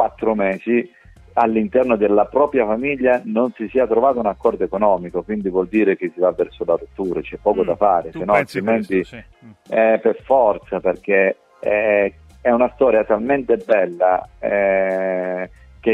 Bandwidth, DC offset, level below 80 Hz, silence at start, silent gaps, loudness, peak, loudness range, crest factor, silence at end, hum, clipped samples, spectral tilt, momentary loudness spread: 10 kHz; under 0.1%; -48 dBFS; 0 s; none; -18 LUFS; -2 dBFS; 2 LU; 16 dB; 0 s; none; under 0.1%; -8 dB/octave; 7 LU